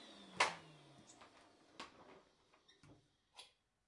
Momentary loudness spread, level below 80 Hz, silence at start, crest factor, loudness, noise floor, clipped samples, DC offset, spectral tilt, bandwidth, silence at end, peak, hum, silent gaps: 28 LU; -86 dBFS; 0 s; 32 dB; -43 LUFS; -73 dBFS; under 0.1%; under 0.1%; -1 dB/octave; 11.5 kHz; 0.4 s; -18 dBFS; none; none